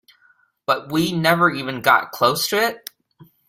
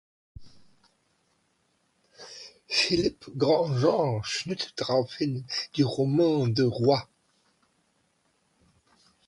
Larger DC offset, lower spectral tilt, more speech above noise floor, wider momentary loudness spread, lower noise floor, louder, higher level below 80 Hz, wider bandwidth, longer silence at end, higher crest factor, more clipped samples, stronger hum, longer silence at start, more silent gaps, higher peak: neither; second, -4 dB/octave vs -5.5 dB/octave; second, 40 dB vs 46 dB; about the same, 11 LU vs 9 LU; second, -59 dBFS vs -71 dBFS; first, -19 LUFS vs -26 LUFS; about the same, -60 dBFS vs -60 dBFS; first, 16.5 kHz vs 11.5 kHz; second, 0.7 s vs 2.25 s; about the same, 20 dB vs 20 dB; neither; neither; first, 0.7 s vs 0.4 s; neither; first, -2 dBFS vs -10 dBFS